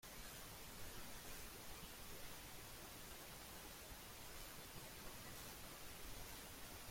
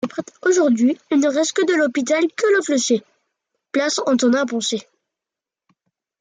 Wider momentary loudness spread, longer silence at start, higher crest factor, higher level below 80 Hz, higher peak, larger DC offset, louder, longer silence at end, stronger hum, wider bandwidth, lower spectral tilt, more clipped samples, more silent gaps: second, 1 LU vs 6 LU; about the same, 0 s vs 0.05 s; about the same, 16 dB vs 14 dB; first, -64 dBFS vs -72 dBFS; second, -38 dBFS vs -6 dBFS; neither; second, -54 LUFS vs -19 LUFS; second, 0 s vs 1.4 s; neither; first, 16.5 kHz vs 9.6 kHz; about the same, -2.5 dB/octave vs -3 dB/octave; neither; neither